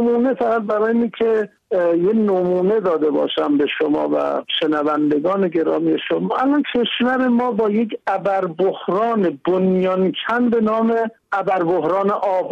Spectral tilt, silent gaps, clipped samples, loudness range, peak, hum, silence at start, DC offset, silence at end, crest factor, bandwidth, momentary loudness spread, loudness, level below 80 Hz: -7.5 dB/octave; none; under 0.1%; 1 LU; -8 dBFS; none; 0 s; under 0.1%; 0 s; 10 dB; 7 kHz; 3 LU; -18 LUFS; -62 dBFS